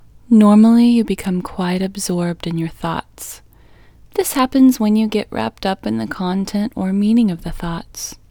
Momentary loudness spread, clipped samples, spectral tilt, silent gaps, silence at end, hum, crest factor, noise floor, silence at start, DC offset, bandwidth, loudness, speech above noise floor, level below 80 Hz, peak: 16 LU; under 0.1%; -6 dB/octave; none; 0.15 s; none; 16 dB; -46 dBFS; 0.3 s; under 0.1%; 19.5 kHz; -17 LUFS; 30 dB; -42 dBFS; 0 dBFS